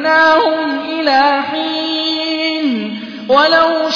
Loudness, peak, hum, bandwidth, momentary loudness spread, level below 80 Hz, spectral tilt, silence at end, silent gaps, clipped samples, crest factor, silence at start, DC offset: -13 LUFS; 0 dBFS; none; 5.4 kHz; 9 LU; -56 dBFS; -4 dB/octave; 0 s; none; under 0.1%; 12 dB; 0 s; under 0.1%